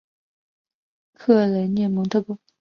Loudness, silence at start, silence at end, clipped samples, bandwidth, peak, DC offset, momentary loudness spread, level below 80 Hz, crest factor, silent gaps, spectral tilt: -21 LUFS; 1.2 s; 0.25 s; under 0.1%; 6.8 kHz; -4 dBFS; under 0.1%; 9 LU; -66 dBFS; 18 dB; none; -8.5 dB/octave